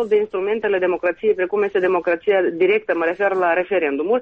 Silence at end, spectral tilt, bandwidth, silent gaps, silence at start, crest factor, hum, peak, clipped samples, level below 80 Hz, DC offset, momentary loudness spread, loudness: 0 s; -7 dB/octave; 4.7 kHz; none; 0 s; 12 dB; none; -6 dBFS; under 0.1%; -60 dBFS; under 0.1%; 3 LU; -19 LUFS